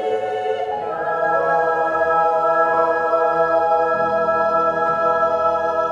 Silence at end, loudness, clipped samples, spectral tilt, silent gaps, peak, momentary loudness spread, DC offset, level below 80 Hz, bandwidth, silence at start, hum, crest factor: 0 s; -18 LUFS; under 0.1%; -5.5 dB/octave; none; -6 dBFS; 6 LU; under 0.1%; -58 dBFS; 7.8 kHz; 0 s; none; 12 dB